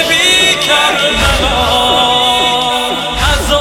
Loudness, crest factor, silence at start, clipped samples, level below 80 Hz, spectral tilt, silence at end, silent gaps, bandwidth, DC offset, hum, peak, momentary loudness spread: -9 LUFS; 10 dB; 0 s; under 0.1%; -24 dBFS; -2 dB/octave; 0 s; none; 17.5 kHz; under 0.1%; none; 0 dBFS; 5 LU